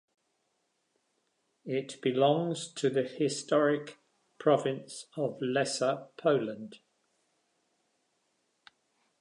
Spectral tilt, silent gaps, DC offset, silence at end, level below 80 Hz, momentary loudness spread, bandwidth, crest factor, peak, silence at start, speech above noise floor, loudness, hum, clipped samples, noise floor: -5 dB/octave; none; under 0.1%; 2.45 s; -84 dBFS; 13 LU; 11 kHz; 20 dB; -12 dBFS; 1.65 s; 48 dB; -30 LUFS; none; under 0.1%; -78 dBFS